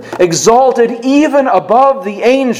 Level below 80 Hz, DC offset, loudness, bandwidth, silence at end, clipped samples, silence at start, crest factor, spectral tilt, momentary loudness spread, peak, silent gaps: -50 dBFS; under 0.1%; -10 LUFS; 15.5 kHz; 0 s; 0.5%; 0 s; 10 dB; -4 dB/octave; 4 LU; 0 dBFS; none